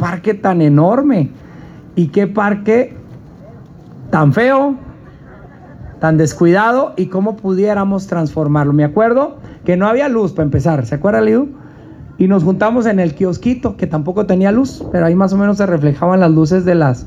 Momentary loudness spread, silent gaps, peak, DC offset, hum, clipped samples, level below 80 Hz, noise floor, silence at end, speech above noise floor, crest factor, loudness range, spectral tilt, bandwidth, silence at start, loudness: 7 LU; none; 0 dBFS; under 0.1%; none; under 0.1%; -42 dBFS; -36 dBFS; 0 s; 24 dB; 14 dB; 3 LU; -8 dB/octave; 7.8 kHz; 0 s; -13 LUFS